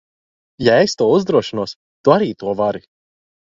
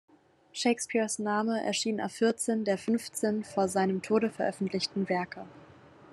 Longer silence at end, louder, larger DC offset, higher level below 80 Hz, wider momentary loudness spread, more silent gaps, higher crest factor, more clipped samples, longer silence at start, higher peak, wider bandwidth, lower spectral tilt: first, 0.8 s vs 0.5 s; first, -17 LUFS vs -30 LUFS; neither; first, -54 dBFS vs -78 dBFS; first, 11 LU vs 4 LU; first, 1.76-2.04 s vs none; about the same, 18 dB vs 18 dB; neither; about the same, 0.6 s vs 0.55 s; first, 0 dBFS vs -14 dBFS; second, 7.6 kHz vs 13 kHz; first, -5.5 dB/octave vs -4 dB/octave